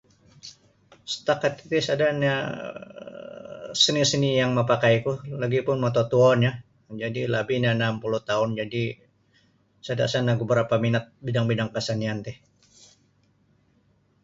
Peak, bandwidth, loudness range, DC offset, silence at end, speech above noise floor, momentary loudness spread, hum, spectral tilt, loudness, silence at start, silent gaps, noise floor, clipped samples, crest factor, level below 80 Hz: -6 dBFS; 7.8 kHz; 5 LU; under 0.1%; 1.9 s; 40 dB; 20 LU; none; -5 dB/octave; -24 LUFS; 0.45 s; none; -64 dBFS; under 0.1%; 20 dB; -60 dBFS